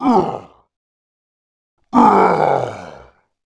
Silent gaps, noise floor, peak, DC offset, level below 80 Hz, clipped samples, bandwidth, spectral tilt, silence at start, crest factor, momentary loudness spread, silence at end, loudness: 0.76-1.77 s; -46 dBFS; 0 dBFS; under 0.1%; -52 dBFS; under 0.1%; 11 kHz; -7.5 dB/octave; 0 s; 18 dB; 18 LU; 0.55 s; -14 LUFS